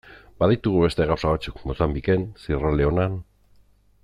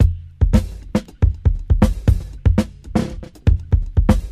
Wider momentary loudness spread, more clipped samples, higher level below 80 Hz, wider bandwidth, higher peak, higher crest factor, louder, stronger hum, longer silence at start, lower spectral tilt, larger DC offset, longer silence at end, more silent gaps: about the same, 7 LU vs 5 LU; neither; second, -36 dBFS vs -20 dBFS; second, 11 kHz vs 13 kHz; second, -6 dBFS vs 0 dBFS; about the same, 18 dB vs 16 dB; second, -23 LUFS vs -20 LUFS; first, 50 Hz at -50 dBFS vs none; about the same, 0.05 s vs 0 s; about the same, -8 dB/octave vs -8 dB/octave; second, under 0.1% vs 0.3%; first, 0.8 s vs 0 s; neither